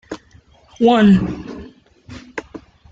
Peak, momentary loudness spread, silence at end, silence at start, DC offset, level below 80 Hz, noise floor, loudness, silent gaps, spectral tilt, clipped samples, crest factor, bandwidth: -2 dBFS; 23 LU; 0.35 s; 0.1 s; under 0.1%; -44 dBFS; -49 dBFS; -14 LUFS; none; -7.5 dB/octave; under 0.1%; 16 dB; 7.8 kHz